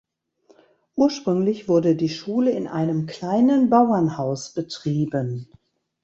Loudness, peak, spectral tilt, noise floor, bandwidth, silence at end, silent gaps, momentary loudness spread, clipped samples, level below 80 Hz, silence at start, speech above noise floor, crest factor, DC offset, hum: -21 LUFS; -4 dBFS; -7 dB/octave; -59 dBFS; 8 kHz; 0.6 s; none; 11 LU; under 0.1%; -62 dBFS; 0.95 s; 39 dB; 18 dB; under 0.1%; none